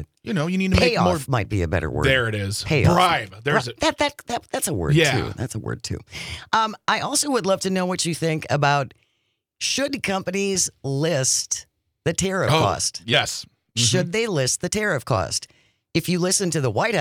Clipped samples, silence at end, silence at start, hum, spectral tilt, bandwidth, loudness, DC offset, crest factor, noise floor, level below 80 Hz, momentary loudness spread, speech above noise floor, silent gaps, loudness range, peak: under 0.1%; 0 s; 0 s; none; -4 dB/octave; 18.5 kHz; -22 LUFS; under 0.1%; 20 dB; -73 dBFS; -46 dBFS; 10 LU; 51 dB; none; 3 LU; -2 dBFS